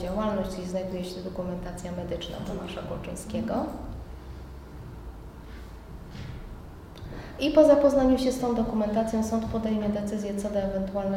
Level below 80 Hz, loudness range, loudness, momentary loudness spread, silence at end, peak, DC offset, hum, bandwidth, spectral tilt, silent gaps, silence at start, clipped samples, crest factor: -44 dBFS; 16 LU; -27 LUFS; 22 LU; 0 s; -6 dBFS; under 0.1%; none; 16 kHz; -6.5 dB/octave; none; 0 s; under 0.1%; 22 dB